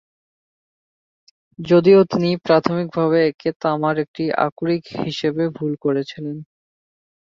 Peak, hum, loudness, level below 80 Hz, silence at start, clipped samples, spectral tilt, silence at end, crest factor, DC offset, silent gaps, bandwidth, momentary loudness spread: -2 dBFS; none; -19 LUFS; -60 dBFS; 1.6 s; under 0.1%; -7.5 dB/octave; 0.95 s; 18 dB; under 0.1%; 3.35-3.39 s, 3.56-3.60 s, 4.08-4.14 s, 4.52-4.56 s; 7.2 kHz; 12 LU